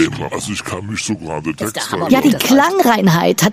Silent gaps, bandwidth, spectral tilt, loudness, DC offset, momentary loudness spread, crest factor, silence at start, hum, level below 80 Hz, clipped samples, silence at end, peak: none; 15.5 kHz; -4.5 dB/octave; -15 LUFS; under 0.1%; 11 LU; 14 dB; 0 s; none; -48 dBFS; under 0.1%; 0 s; 0 dBFS